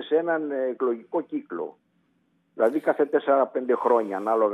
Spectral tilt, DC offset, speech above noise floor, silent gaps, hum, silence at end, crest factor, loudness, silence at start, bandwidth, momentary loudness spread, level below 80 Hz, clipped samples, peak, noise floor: -7 dB/octave; under 0.1%; 44 dB; none; none; 0 s; 16 dB; -25 LUFS; 0 s; 9.6 kHz; 10 LU; -88 dBFS; under 0.1%; -8 dBFS; -68 dBFS